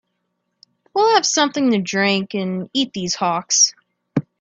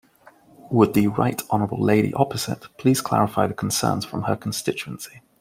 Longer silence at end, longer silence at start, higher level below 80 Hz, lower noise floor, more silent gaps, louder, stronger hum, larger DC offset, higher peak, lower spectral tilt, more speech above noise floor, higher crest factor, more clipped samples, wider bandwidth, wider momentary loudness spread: about the same, 0.2 s vs 0.2 s; first, 0.95 s vs 0.65 s; second, -64 dBFS vs -56 dBFS; first, -73 dBFS vs -53 dBFS; neither; first, -18 LUFS vs -22 LUFS; first, 60 Hz at -45 dBFS vs none; neither; about the same, 0 dBFS vs -2 dBFS; second, -2.5 dB/octave vs -5.5 dB/octave; first, 55 dB vs 31 dB; about the same, 20 dB vs 20 dB; neither; second, 7.8 kHz vs 16 kHz; about the same, 11 LU vs 10 LU